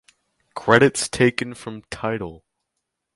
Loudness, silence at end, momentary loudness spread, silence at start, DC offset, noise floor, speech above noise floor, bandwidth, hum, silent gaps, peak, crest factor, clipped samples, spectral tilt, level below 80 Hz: -20 LUFS; 0.8 s; 20 LU; 0.55 s; under 0.1%; -79 dBFS; 59 dB; 11.5 kHz; none; none; 0 dBFS; 22 dB; under 0.1%; -4.5 dB/octave; -52 dBFS